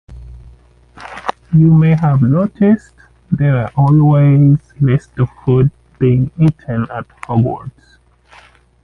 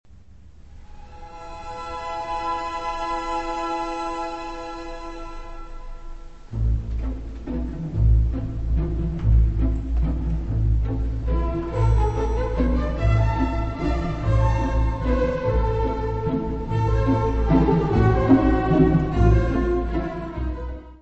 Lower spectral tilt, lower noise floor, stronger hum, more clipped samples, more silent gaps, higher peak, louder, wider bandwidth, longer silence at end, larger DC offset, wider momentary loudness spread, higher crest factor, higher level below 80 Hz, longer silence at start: first, -10.5 dB/octave vs -8.5 dB/octave; about the same, -45 dBFS vs -48 dBFS; neither; neither; neither; about the same, -2 dBFS vs -4 dBFS; first, -13 LUFS vs -23 LUFS; second, 4.2 kHz vs 7.6 kHz; first, 1.15 s vs 0.05 s; second, under 0.1% vs 0.5%; about the same, 15 LU vs 16 LU; second, 12 dB vs 18 dB; second, -40 dBFS vs -26 dBFS; second, 0.1 s vs 0.6 s